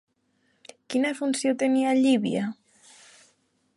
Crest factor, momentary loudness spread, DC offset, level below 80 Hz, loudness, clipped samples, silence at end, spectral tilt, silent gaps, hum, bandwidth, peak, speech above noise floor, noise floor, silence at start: 16 dB; 9 LU; under 0.1%; -74 dBFS; -25 LUFS; under 0.1%; 1.25 s; -4.5 dB/octave; none; none; 11.5 kHz; -10 dBFS; 46 dB; -70 dBFS; 0.9 s